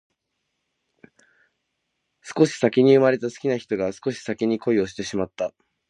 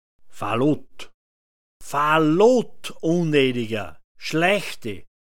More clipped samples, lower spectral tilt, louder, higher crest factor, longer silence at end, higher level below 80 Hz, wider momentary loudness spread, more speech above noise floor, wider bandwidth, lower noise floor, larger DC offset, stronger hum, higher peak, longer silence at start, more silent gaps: neither; about the same, -6 dB/octave vs -5.5 dB/octave; about the same, -22 LUFS vs -21 LUFS; about the same, 20 dB vs 18 dB; first, 0.4 s vs 0.25 s; second, -62 dBFS vs -56 dBFS; second, 13 LU vs 17 LU; second, 56 dB vs over 69 dB; second, 10.5 kHz vs 17 kHz; second, -77 dBFS vs under -90 dBFS; second, under 0.1% vs 2%; neither; about the same, -4 dBFS vs -4 dBFS; first, 2.25 s vs 0.2 s; second, none vs 1.14-1.80 s, 4.04-4.15 s